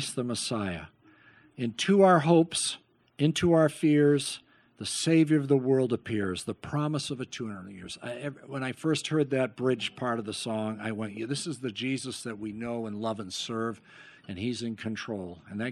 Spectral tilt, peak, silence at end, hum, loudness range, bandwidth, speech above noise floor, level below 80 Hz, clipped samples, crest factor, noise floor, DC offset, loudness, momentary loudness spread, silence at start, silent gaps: -5 dB/octave; -8 dBFS; 0 s; none; 10 LU; 12.5 kHz; 30 dB; -64 dBFS; under 0.1%; 20 dB; -58 dBFS; under 0.1%; -29 LUFS; 15 LU; 0 s; none